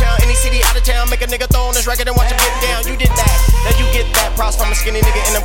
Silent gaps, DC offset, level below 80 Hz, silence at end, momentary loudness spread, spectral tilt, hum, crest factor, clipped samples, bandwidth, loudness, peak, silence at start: none; under 0.1%; -14 dBFS; 0 s; 3 LU; -3 dB/octave; none; 12 dB; under 0.1%; 17 kHz; -14 LUFS; 0 dBFS; 0 s